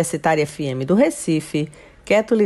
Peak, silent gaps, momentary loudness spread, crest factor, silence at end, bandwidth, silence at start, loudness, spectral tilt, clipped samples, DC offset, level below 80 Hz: -6 dBFS; none; 8 LU; 14 dB; 0 s; 12.5 kHz; 0 s; -20 LUFS; -5.5 dB/octave; under 0.1%; under 0.1%; -52 dBFS